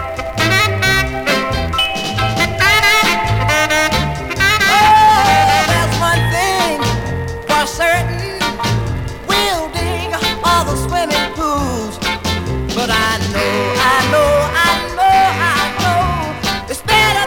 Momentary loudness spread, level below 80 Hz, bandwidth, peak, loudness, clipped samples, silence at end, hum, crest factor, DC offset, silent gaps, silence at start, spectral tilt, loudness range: 9 LU; -30 dBFS; 19 kHz; -2 dBFS; -14 LUFS; under 0.1%; 0 s; none; 12 dB; under 0.1%; none; 0 s; -3.5 dB/octave; 5 LU